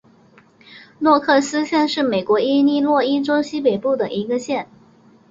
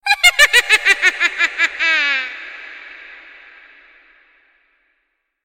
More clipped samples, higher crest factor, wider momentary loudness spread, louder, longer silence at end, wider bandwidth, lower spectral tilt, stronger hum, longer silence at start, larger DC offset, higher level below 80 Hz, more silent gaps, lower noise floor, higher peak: neither; about the same, 18 dB vs 18 dB; second, 7 LU vs 24 LU; second, -18 LUFS vs -12 LUFS; second, 0.65 s vs 2.3 s; second, 7.8 kHz vs 16.5 kHz; first, -4.5 dB/octave vs 2 dB/octave; neither; first, 0.7 s vs 0.05 s; neither; second, -64 dBFS vs -50 dBFS; neither; second, -51 dBFS vs -70 dBFS; about the same, -2 dBFS vs 0 dBFS